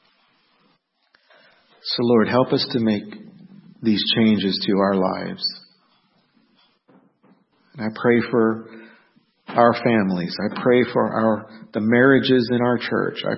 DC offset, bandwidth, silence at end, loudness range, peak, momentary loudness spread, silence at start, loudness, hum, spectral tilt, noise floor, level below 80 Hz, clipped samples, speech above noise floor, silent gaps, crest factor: under 0.1%; 5.8 kHz; 0 s; 6 LU; 0 dBFS; 11 LU; 1.85 s; -20 LUFS; none; -10.5 dB/octave; -64 dBFS; -64 dBFS; under 0.1%; 45 dB; none; 20 dB